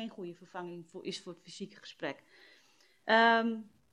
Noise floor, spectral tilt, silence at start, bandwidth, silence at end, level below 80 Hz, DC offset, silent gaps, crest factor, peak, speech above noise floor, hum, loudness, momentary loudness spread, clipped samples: -67 dBFS; -4 dB/octave; 0 s; 11 kHz; 0.3 s; -84 dBFS; under 0.1%; none; 24 dB; -12 dBFS; 33 dB; none; -31 LUFS; 21 LU; under 0.1%